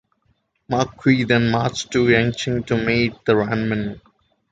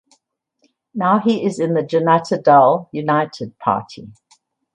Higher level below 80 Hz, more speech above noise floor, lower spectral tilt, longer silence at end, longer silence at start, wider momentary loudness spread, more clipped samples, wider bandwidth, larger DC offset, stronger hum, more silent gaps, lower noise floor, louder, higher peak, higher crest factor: first, -46 dBFS vs -64 dBFS; about the same, 47 dB vs 50 dB; about the same, -6 dB/octave vs -7 dB/octave; about the same, 0.55 s vs 0.65 s; second, 0.7 s vs 0.95 s; second, 7 LU vs 13 LU; neither; second, 9.2 kHz vs 10.5 kHz; neither; neither; neither; about the same, -66 dBFS vs -67 dBFS; about the same, -19 LUFS vs -17 LUFS; about the same, -2 dBFS vs 0 dBFS; about the same, 18 dB vs 18 dB